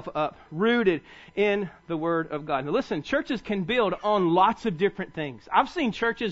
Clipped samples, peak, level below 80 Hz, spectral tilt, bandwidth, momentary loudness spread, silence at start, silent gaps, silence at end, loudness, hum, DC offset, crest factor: under 0.1%; -8 dBFS; -56 dBFS; -6.5 dB/octave; 8 kHz; 9 LU; 0 s; none; 0 s; -26 LUFS; none; under 0.1%; 18 dB